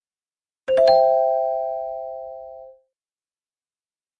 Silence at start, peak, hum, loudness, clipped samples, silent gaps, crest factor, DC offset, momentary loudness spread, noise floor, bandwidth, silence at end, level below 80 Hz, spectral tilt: 0.7 s; -6 dBFS; none; -19 LUFS; under 0.1%; none; 18 dB; under 0.1%; 21 LU; under -90 dBFS; 9.4 kHz; 1.5 s; -62 dBFS; -4 dB/octave